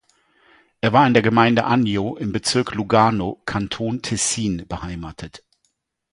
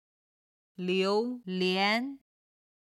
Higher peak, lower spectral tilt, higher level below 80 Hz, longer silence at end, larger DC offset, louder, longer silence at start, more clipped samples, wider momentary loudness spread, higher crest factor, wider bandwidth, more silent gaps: first, 0 dBFS vs -14 dBFS; about the same, -4.5 dB/octave vs -5.5 dB/octave; first, -46 dBFS vs -86 dBFS; about the same, 0.75 s vs 0.8 s; neither; first, -19 LUFS vs -29 LUFS; about the same, 0.85 s vs 0.8 s; neither; first, 15 LU vs 10 LU; about the same, 20 dB vs 18 dB; second, 11.5 kHz vs 13 kHz; neither